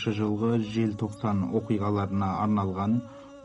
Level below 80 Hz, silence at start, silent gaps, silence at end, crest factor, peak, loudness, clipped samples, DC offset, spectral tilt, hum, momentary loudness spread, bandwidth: -60 dBFS; 0 s; none; 0 s; 14 dB; -14 dBFS; -28 LUFS; under 0.1%; under 0.1%; -8 dB/octave; none; 3 LU; 10.5 kHz